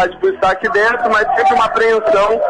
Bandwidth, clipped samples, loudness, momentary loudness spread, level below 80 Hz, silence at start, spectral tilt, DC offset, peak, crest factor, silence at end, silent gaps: 10.5 kHz; under 0.1%; -13 LUFS; 3 LU; -44 dBFS; 0 s; -4 dB/octave; under 0.1%; -2 dBFS; 10 dB; 0 s; none